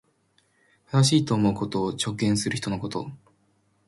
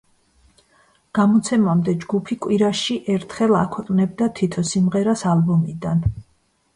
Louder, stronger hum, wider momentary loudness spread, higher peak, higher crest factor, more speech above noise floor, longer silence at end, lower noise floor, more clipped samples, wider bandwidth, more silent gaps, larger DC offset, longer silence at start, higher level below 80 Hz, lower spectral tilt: second, -25 LUFS vs -20 LUFS; neither; first, 12 LU vs 6 LU; about the same, -8 dBFS vs -6 dBFS; about the same, 18 dB vs 14 dB; about the same, 43 dB vs 44 dB; first, 0.7 s vs 0.55 s; first, -67 dBFS vs -63 dBFS; neither; about the same, 11.5 kHz vs 11 kHz; neither; neither; second, 0.9 s vs 1.15 s; second, -56 dBFS vs -44 dBFS; second, -5 dB/octave vs -6.5 dB/octave